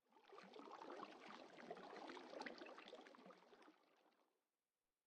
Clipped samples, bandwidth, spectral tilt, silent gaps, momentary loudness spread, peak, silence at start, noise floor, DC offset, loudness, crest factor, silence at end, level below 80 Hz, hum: under 0.1%; 9.4 kHz; -4 dB/octave; none; 11 LU; -38 dBFS; 0.1 s; under -90 dBFS; under 0.1%; -59 LUFS; 22 dB; 0.85 s; under -90 dBFS; none